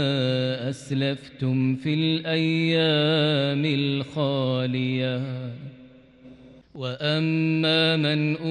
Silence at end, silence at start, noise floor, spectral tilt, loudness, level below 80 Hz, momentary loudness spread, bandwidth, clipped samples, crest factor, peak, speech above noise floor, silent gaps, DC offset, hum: 0 s; 0 s; -49 dBFS; -7 dB/octave; -24 LUFS; -64 dBFS; 10 LU; 10.5 kHz; under 0.1%; 14 dB; -10 dBFS; 26 dB; none; under 0.1%; none